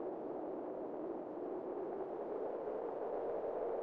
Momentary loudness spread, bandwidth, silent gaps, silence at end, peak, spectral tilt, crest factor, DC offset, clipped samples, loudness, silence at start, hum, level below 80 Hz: 4 LU; 5 kHz; none; 0 s; -30 dBFS; -7 dB/octave; 12 dB; under 0.1%; under 0.1%; -43 LUFS; 0 s; none; -78 dBFS